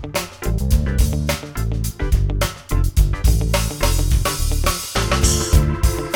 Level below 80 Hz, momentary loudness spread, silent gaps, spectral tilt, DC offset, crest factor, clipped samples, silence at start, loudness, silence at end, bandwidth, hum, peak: -20 dBFS; 7 LU; none; -4.5 dB/octave; under 0.1%; 16 dB; under 0.1%; 0 s; -20 LUFS; 0 s; 20 kHz; none; -2 dBFS